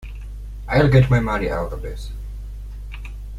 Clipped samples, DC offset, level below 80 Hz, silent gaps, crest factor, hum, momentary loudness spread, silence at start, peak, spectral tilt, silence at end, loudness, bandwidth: under 0.1%; under 0.1%; -30 dBFS; none; 18 dB; 50 Hz at -30 dBFS; 21 LU; 0 s; -2 dBFS; -8 dB/octave; 0 s; -19 LUFS; 11.5 kHz